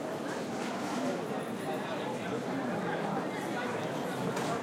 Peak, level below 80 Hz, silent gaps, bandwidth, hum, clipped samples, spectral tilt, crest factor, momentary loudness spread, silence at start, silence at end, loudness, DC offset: -22 dBFS; -74 dBFS; none; 16.5 kHz; none; under 0.1%; -5 dB/octave; 12 dB; 2 LU; 0 s; 0 s; -35 LUFS; under 0.1%